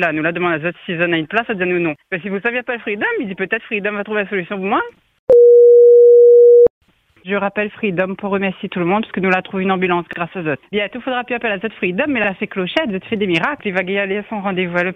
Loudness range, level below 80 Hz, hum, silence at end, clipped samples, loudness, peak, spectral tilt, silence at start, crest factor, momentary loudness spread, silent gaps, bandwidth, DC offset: 10 LU; -56 dBFS; none; 0 s; under 0.1%; -15 LUFS; 0 dBFS; -7.5 dB/octave; 0 s; 14 dB; 14 LU; 5.19-5.27 s, 6.70-6.81 s; 3.9 kHz; under 0.1%